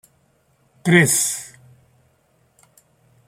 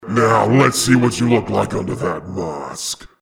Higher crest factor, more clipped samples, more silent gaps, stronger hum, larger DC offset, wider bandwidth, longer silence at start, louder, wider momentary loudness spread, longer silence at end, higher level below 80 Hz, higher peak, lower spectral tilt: first, 22 dB vs 16 dB; neither; neither; neither; neither; about the same, 16 kHz vs 17 kHz; first, 0.85 s vs 0 s; about the same, -17 LUFS vs -17 LUFS; first, 17 LU vs 12 LU; first, 1.8 s vs 0.15 s; second, -62 dBFS vs -46 dBFS; about the same, -2 dBFS vs 0 dBFS; about the same, -4 dB/octave vs -5 dB/octave